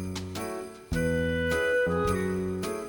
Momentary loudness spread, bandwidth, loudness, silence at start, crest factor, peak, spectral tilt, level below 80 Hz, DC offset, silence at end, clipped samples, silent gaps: 9 LU; over 20 kHz; -29 LUFS; 0 s; 14 dB; -14 dBFS; -5.5 dB/octave; -44 dBFS; under 0.1%; 0 s; under 0.1%; none